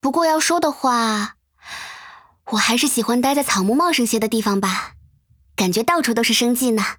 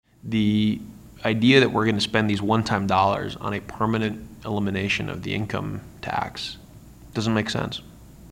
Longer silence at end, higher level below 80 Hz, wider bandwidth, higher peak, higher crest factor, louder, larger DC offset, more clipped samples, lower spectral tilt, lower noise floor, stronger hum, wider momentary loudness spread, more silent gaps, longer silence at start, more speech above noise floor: about the same, 0.05 s vs 0 s; second, -58 dBFS vs -50 dBFS; first, over 20 kHz vs 16 kHz; about the same, -2 dBFS vs -4 dBFS; about the same, 16 dB vs 20 dB; first, -18 LUFS vs -24 LUFS; neither; neither; second, -3 dB/octave vs -6 dB/octave; first, -56 dBFS vs -45 dBFS; neither; first, 16 LU vs 13 LU; neither; second, 0.05 s vs 0.25 s; first, 38 dB vs 22 dB